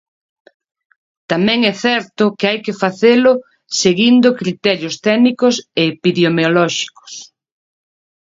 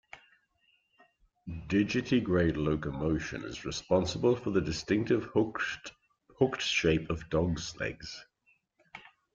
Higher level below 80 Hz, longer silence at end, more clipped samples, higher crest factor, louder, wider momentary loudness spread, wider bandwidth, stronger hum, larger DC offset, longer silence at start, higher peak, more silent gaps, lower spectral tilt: second, -60 dBFS vs -52 dBFS; first, 1.05 s vs 0.35 s; neither; about the same, 16 dB vs 20 dB; first, -14 LUFS vs -31 LUFS; second, 10 LU vs 17 LU; about the same, 7.8 kHz vs 7.8 kHz; neither; neither; first, 1.3 s vs 0.15 s; first, 0 dBFS vs -12 dBFS; neither; about the same, -4.5 dB/octave vs -5.5 dB/octave